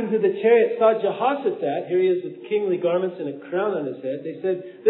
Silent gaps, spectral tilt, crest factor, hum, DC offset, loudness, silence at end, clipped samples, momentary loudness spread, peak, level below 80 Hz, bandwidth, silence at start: none; -10.5 dB/octave; 16 dB; none; under 0.1%; -22 LUFS; 0 s; under 0.1%; 10 LU; -6 dBFS; under -90 dBFS; 4.1 kHz; 0 s